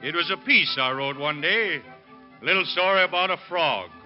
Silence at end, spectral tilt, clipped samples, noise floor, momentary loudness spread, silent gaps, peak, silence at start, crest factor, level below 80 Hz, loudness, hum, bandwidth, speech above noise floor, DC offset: 0.05 s; 0 dB/octave; under 0.1%; -48 dBFS; 8 LU; none; -8 dBFS; 0 s; 18 dB; -72 dBFS; -22 LUFS; none; 5.8 kHz; 25 dB; under 0.1%